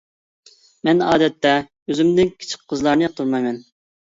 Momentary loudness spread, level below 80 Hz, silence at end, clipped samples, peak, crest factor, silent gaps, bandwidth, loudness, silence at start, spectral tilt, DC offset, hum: 10 LU; -54 dBFS; 0.45 s; under 0.1%; -2 dBFS; 18 dB; 1.82-1.86 s; 7.8 kHz; -19 LUFS; 0.85 s; -5.5 dB/octave; under 0.1%; none